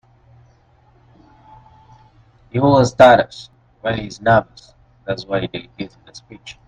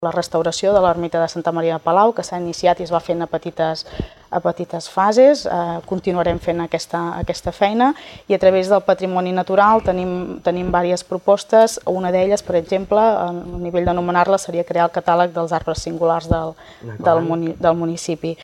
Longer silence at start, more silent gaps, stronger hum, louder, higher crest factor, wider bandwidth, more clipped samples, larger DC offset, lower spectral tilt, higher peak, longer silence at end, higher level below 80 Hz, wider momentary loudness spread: first, 2.55 s vs 0 s; neither; neither; about the same, -16 LUFS vs -18 LUFS; about the same, 20 dB vs 16 dB; second, 9.6 kHz vs 13.5 kHz; neither; neither; about the same, -6 dB/octave vs -5.5 dB/octave; about the same, 0 dBFS vs -2 dBFS; first, 0.15 s vs 0 s; second, -48 dBFS vs -42 dBFS; first, 24 LU vs 10 LU